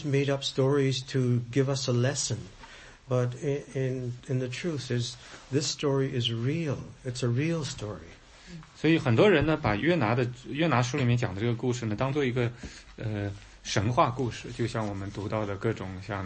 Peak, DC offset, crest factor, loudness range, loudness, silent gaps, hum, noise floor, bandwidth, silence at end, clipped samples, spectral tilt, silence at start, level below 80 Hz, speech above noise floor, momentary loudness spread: -10 dBFS; under 0.1%; 20 dB; 5 LU; -29 LUFS; none; none; -49 dBFS; 8.8 kHz; 0 s; under 0.1%; -5.5 dB/octave; 0 s; -52 dBFS; 21 dB; 12 LU